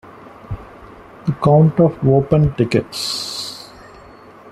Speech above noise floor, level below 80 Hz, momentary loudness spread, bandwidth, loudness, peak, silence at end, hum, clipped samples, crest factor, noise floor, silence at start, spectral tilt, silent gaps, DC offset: 27 dB; -42 dBFS; 20 LU; 13.5 kHz; -16 LUFS; -2 dBFS; 0 s; none; under 0.1%; 16 dB; -41 dBFS; 0.05 s; -6.5 dB/octave; none; under 0.1%